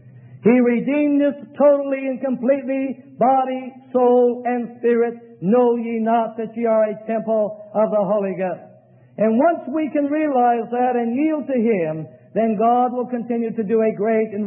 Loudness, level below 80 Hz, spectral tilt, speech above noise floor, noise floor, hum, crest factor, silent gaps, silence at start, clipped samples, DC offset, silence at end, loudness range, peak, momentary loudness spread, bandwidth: -19 LUFS; -74 dBFS; -12.5 dB/octave; 30 dB; -49 dBFS; none; 16 dB; none; 0.05 s; under 0.1%; under 0.1%; 0 s; 2 LU; -4 dBFS; 8 LU; 3.8 kHz